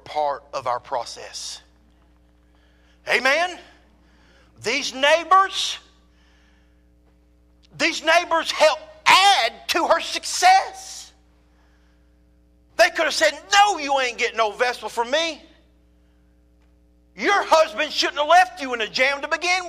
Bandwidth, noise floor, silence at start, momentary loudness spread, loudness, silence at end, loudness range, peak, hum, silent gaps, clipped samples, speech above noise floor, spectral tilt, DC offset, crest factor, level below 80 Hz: 15.5 kHz; -57 dBFS; 0.05 s; 16 LU; -19 LUFS; 0 s; 8 LU; -4 dBFS; none; none; under 0.1%; 36 dB; -0.5 dB/octave; under 0.1%; 18 dB; -58 dBFS